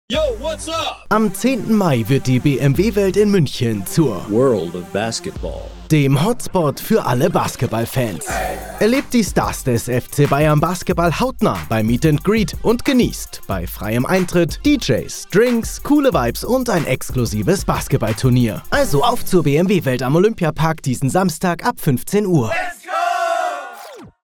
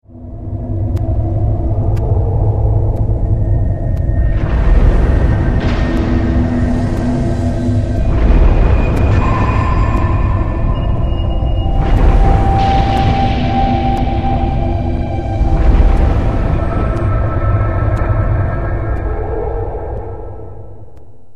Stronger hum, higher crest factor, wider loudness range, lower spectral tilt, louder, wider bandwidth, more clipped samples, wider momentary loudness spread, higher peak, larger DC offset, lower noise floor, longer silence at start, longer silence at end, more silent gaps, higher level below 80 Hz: neither; about the same, 14 dB vs 12 dB; about the same, 2 LU vs 3 LU; second, -6 dB/octave vs -8.5 dB/octave; about the same, -17 LUFS vs -15 LUFS; first, 18 kHz vs 7.4 kHz; neither; about the same, 7 LU vs 7 LU; about the same, -2 dBFS vs 0 dBFS; second, under 0.1% vs 3%; about the same, -37 dBFS vs -40 dBFS; about the same, 0.1 s vs 0 s; second, 0.15 s vs 0.5 s; neither; second, -34 dBFS vs -16 dBFS